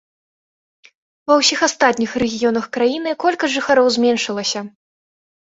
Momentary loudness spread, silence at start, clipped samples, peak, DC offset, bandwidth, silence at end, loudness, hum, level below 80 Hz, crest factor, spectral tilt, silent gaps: 8 LU; 1.3 s; under 0.1%; -2 dBFS; under 0.1%; 8 kHz; 0.75 s; -17 LUFS; none; -58 dBFS; 18 dB; -2.5 dB/octave; none